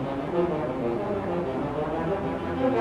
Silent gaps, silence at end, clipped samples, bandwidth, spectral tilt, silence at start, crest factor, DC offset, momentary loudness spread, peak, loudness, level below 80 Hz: none; 0 s; under 0.1%; 11 kHz; -8.5 dB/octave; 0 s; 14 dB; under 0.1%; 3 LU; -12 dBFS; -28 LUFS; -48 dBFS